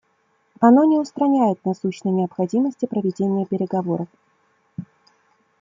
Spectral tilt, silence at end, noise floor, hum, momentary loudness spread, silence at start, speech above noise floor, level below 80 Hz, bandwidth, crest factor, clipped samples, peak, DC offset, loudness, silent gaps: -8.5 dB/octave; 0.75 s; -65 dBFS; none; 19 LU; 0.6 s; 46 dB; -70 dBFS; 7.6 kHz; 18 dB; under 0.1%; -2 dBFS; under 0.1%; -20 LUFS; none